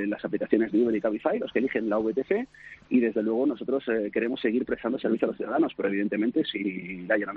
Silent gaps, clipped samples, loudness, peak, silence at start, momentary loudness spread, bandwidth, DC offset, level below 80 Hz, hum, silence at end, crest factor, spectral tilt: none; under 0.1%; -27 LUFS; -8 dBFS; 0 s; 5 LU; 4.7 kHz; under 0.1%; -64 dBFS; none; 0 s; 18 dB; -4.5 dB/octave